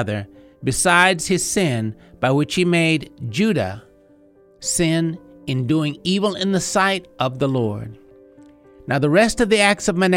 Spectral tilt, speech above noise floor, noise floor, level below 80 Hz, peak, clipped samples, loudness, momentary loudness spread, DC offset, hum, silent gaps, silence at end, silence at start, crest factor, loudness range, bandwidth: -4.5 dB/octave; 33 dB; -51 dBFS; -46 dBFS; 0 dBFS; under 0.1%; -19 LUFS; 13 LU; under 0.1%; none; none; 0 s; 0 s; 18 dB; 4 LU; 16.5 kHz